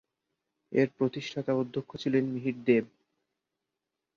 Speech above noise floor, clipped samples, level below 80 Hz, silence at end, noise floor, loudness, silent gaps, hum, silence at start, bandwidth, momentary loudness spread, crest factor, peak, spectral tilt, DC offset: 58 dB; under 0.1%; -72 dBFS; 1.3 s; -87 dBFS; -30 LUFS; none; none; 0.7 s; 7.2 kHz; 8 LU; 20 dB; -10 dBFS; -7.5 dB/octave; under 0.1%